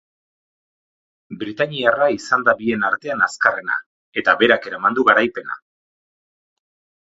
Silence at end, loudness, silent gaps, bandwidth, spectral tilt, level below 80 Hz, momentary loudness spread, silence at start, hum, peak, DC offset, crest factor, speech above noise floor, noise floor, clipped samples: 1.45 s; -18 LUFS; 3.86-4.12 s; 8 kHz; -4 dB/octave; -64 dBFS; 14 LU; 1.3 s; none; 0 dBFS; under 0.1%; 20 dB; over 72 dB; under -90 dBFS; under 0.1%